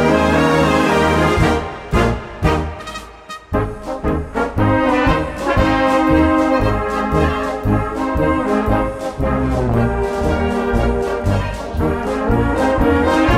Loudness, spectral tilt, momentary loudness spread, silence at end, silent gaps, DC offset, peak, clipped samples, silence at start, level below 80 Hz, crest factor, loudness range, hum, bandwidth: -17 LUFS; -6.5 dB/octave; 8 LU; 0 s; none; under 0.1%; -2 dBFS; under 0.1%; 0 s; -26 dBFS; 14 dB; 3 LU; none; 15.5 kHz